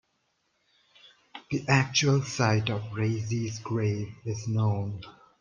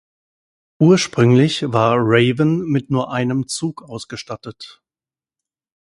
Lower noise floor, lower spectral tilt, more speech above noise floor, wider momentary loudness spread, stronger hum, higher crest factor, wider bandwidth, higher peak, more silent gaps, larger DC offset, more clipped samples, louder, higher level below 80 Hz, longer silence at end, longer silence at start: second, -74 dBFS vs under -90 dBFS; about the same, -5 dB/octave vs -6 dB/octave; second, 47 dB vs over 73 dB; second, 13 LU vs 17 LU; neither; about the same, 20 dB vs 18 dB; second, 7.4 kHz vs 11.5 kHz; second, -8 dBFS vs 0 dBFS; neither; neither; neither; second, -28 LUFS vs -16 LUFS; second, -62 dBFS vs -56 dBFS; second, 0.3 s vs 1.2 s; first, 1.35 s vs 0.8 s